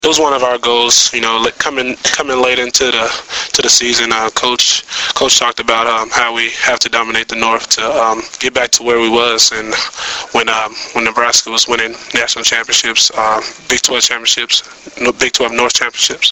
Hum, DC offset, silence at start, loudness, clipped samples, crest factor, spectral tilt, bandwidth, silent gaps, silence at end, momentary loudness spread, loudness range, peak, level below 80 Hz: none; under 0.1%; 0 s; -11 LUFS; 0.1%; 14 dB; 0 dB/octave; over 20 kHz; none; 0 s; 7 LU; 2 LU; 0 dBFS; -46 dBFS